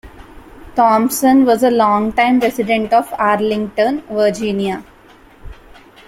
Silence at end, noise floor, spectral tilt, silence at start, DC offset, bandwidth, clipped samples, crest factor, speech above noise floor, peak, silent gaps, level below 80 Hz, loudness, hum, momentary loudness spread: 0.55 s; -44 dBFS; -5 dB/octave; 0.05 s; under 0.1%; 16.5 kHz; under 0.1%; 14 dB; 30 dB; -2 dBFS; none; -44 dBFS; -15 LUFS; none; 7 LU